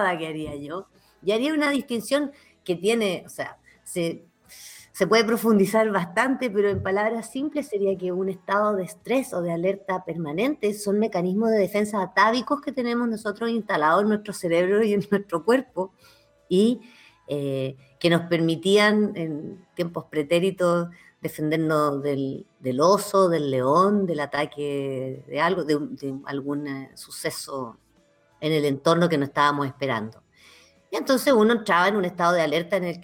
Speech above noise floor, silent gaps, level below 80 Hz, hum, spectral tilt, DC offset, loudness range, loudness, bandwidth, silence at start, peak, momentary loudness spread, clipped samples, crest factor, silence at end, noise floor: 38 dB; none; -66 dBFS; none; -5.5 dB/octave; under 0.1%; 4 LU; -24 LUFS; 18 kHz; 0 s; -6 dBFS; 13 LU; under 0.1%; 18 dB; 0 s; -62 dBFS